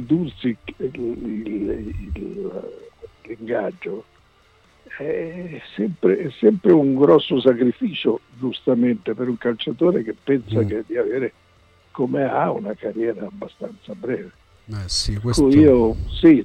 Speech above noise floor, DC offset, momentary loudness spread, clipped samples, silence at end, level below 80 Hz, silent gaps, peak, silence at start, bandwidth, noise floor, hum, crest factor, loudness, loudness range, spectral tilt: 36 dB; under 0.1%; 18 LU; under 0.1%; 0 s; -40 dBFS; none; -4 dBFS; 0 s; 10.5 kHz; -55 dBFS; none; 16 dB; -20 LUFS; 11 LU; -6.5 dB/octave